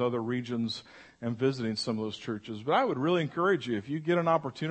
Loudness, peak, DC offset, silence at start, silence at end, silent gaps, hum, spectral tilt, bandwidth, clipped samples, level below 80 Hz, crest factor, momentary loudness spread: -30 LUFS; -12 dBFS; under 0.1%; 0 s; 0 s; none; none; -6.5 dB/octave; 8.8 kHz; under 0.1%; -72 dBFS; 18 dB; 10 LU